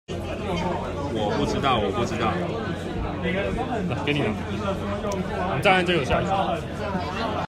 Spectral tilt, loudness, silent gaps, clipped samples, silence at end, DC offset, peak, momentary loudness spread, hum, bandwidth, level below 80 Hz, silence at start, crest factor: -6 dB/octave; -25 LUFS; none; under 0.1%; 0 s; under 0.1%; -4 dBFS; 7 LU; none; 14.5 kHz; -42 dBFS; 0.1 s; 20 dB